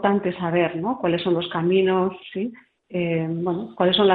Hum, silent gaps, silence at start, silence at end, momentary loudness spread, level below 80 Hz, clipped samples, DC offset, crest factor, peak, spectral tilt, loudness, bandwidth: none; none; 0 s; 0 s; 11 LU; -60 dBFS; under 0.1%; under 0.1%; 18 dB; -4 dBFS; -10.5 dB/octave; -23 LUFS; 4.7 kHz